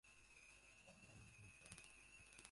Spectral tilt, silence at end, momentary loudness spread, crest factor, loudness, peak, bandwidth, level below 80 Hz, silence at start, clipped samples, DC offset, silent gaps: -2.5 dB/octave; 0 s; 5 LU; 30 dB; -64 LUFS; -34 dBFS; 11.5 kHz; -76 dBFS; 0.05 s; under 0.1%; under 0.1%; none